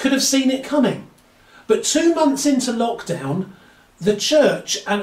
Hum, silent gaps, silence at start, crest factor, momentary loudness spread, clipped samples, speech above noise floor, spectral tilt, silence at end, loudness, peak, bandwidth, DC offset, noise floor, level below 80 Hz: none; none; 0 s; 16 dB; 10 LU; under 0.1%; 32 dB; -3.5 dB/octave; 0 s; -18 LUFS; -4 dBFS; 16 kHz; under 0.1%; -50 dBFS; -58 dBFS